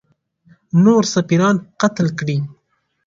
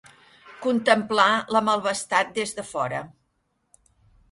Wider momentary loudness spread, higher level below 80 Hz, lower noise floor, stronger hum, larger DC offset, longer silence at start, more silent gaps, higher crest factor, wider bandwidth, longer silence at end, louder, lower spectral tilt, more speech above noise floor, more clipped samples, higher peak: about the same, 9 LU vs 10 LU; first, -56 dBFS vs -64 dBFS; second, -67 dBFS vs -72 dBFS; neither; neither; first, 0.75 s vs 0.45 s; neither; second, 16 dB vs 22 dB; second, 7.6 kHz vs 11.5 kHz; second, 0.55 s vs 1.25 s; first, -16 LUFS vs -23 LUFS; first, -6 dB/octave vs -3.5 dB/octave; about the same, 52 dB vs 49 dB; neither; about the same, 0 dBFS vs -2 dBFS